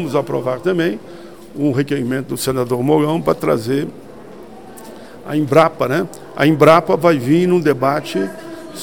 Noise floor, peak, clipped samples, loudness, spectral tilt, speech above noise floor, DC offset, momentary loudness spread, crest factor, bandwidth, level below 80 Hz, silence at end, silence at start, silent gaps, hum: -36 dBFS; 0 dBFS; under 0.1%; -16 LUFS; -6.5 dB/octave; 21 dB; 0.7%; 24 LU; 16 dB; 18 kHz; -52 dBFS; 0 s; 0 s; none; none